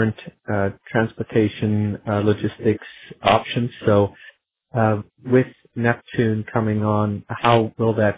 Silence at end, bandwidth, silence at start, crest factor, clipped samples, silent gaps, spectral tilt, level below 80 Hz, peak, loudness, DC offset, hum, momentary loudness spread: 0 s; 4 kHz; 0 s; 20 dB; under 0.1%; none; -11 dB/octave; -48 dBFS; 0 dBFS; -21 LUFS; under 0.1%; none; 7 LU